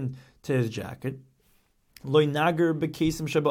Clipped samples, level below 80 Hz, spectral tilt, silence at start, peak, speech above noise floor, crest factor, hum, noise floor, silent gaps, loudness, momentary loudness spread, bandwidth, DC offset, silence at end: under 0.1%; -54 dBFS; -6.5 dB/octave; 0 s; -10 dBFS; 39 dB; 18 dB; none; -65 dBFS; none; -26 LUFS; 15 LU; 16.5 kHz; under 0.1%; 0 s